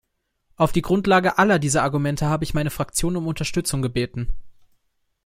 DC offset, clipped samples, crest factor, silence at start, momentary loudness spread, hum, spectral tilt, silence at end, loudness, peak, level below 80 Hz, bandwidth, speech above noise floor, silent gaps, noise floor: under 0.1%; under 0.1%; 18 dB; 0.6 s; 8 LU; none; -5 dB/octave; 0.75 s; -21 LUFS; -4 dBFS; -38 dBFS; 16 kHz; 49 dB; none; -69 dBFS